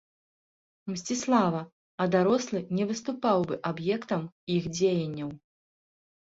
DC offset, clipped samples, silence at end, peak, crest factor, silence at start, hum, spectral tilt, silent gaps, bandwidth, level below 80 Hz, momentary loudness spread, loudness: under 0.1%; under 0.1%; 1 s; -10 dBFS; 20 dB; 0.85 s; none; -5.5 dB/octave; 1.72-1.98 s, 4.32-4.47 s; 8 kHz; -66 dBFS; 12 LU; -29 LUFS